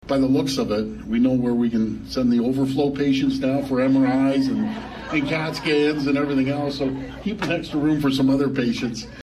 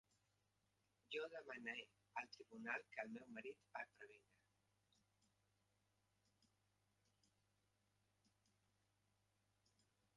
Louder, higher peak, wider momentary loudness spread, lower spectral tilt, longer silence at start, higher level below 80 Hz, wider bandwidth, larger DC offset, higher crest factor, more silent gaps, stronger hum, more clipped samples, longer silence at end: first, -22 LUFS vs -53 LUFS; first, -8 dBFS vs -32 dBFS; about the same, 7 LU vs 8 LU; first, -6.5 dB/octave vs -3.5 dB/octave; second, 0.05 s vs 1.1 s; first, -46 dBFS vs under -90 dBFS; first, 13 kHz vs 11 kHz; neither; second, 12 dB vs 26 dB; neither; second, none vs 50 Hz at -85 dBFS; neither; second, 0 s vs 5.95 s